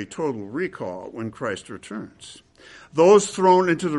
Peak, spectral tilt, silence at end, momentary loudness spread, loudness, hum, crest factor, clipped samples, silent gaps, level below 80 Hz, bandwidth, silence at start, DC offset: -4 dBFS; -5 dB/octave; 0 s; 20 LU; -20 LUFS; none; 18 dB; under 0.1%; none; -64 dBFS; 11.5 kHz; 0 s; under 0.1%